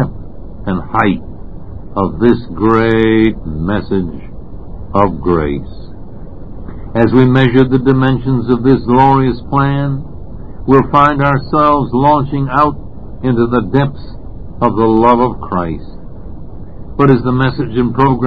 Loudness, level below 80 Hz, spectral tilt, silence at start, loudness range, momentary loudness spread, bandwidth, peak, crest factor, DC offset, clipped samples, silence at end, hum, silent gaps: -12 LUFS; -30 dBFS; -10 dB/octave; 0 s; 4 LU; 23 LU; 5.2 kHz; 0 dBFS; 14 dB; 4%; 0.4%; 0 s; none; none